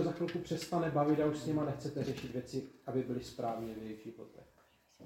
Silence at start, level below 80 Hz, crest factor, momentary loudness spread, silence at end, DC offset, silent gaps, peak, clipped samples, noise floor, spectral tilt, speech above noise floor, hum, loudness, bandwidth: 0 s; -66 dBFS; 18 dB; 15 LU; 0 s; under 0.1%; none; -20 dBFS; under 0.1%; -68 dBFS; -6.5 dB/octave; 31 dB; none; -37 LUFS; 16.5 kHz